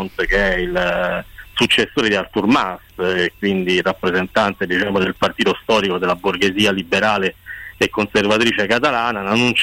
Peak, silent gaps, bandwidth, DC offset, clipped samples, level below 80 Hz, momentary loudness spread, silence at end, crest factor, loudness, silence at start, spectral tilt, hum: -6 dBFS; none; 16.5 kHz; under 0.1%; under 0.1%; -38 dBFS; 5 LU; 0 s; 12 dB; -17 LUFS; 0 s; -4.5 dB/octave; none